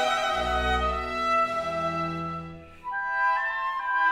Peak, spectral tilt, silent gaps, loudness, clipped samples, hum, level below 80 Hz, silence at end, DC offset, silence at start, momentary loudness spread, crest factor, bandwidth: -14 dBFS; -4 dB/octave; none; -27 LUFS; under 0.1%; none; -42 dBFS; 0 s; under 0.1%; 0 s; 10 LU; 14 dB; 16 kHz